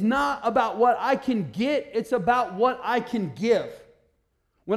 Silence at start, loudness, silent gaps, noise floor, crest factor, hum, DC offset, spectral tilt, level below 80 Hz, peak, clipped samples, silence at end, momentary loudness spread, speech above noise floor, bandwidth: 0 s; -24 LUFS; none; -71 dBFS; 16 dB; none; under 0.1%; -6 dB/octave; -58 dBFS; -10 dBFS; under 0.1%; 0 s; 6 LU; 47 dB; 14.5 kHz